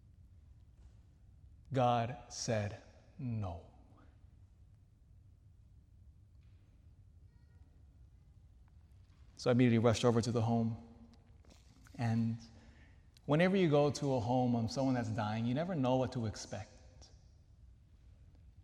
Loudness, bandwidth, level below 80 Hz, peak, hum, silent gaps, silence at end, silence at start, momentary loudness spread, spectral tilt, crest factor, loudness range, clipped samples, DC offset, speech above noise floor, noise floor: -34 LUFS; 11 kHz; -64 dBFS; -18 dBFS; none; none; 0.15 s; 0.85 s; 17 LU; -6.5 dB/octave; 20 dB; 10 LU; under 0.1%; under 0.1%; 29 dB; -63 dBFS